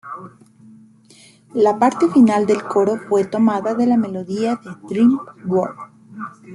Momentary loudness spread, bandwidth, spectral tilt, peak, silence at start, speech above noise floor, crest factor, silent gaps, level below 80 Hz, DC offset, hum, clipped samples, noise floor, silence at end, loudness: 20 LU; 11.5 kHz; -7 dB/octave; -2 dBFS; 0.05 s; 32 dB; 16 dB; none; -64 dBFS; under 0.1%; none; under 0.1%; -48 dBFS; 0 s; -18 LUFS